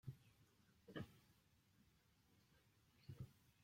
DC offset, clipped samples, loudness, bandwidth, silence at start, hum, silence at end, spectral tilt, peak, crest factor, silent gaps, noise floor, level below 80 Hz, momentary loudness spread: under 0.1%; under 0.1%; -60 LUFS; 16.5 kHz; 0.05 s; none; 0 s; -6.5 dB/octave; -38 dBFS; 24 dB; none; -78 dBFS; -80 dBFS; 10 LU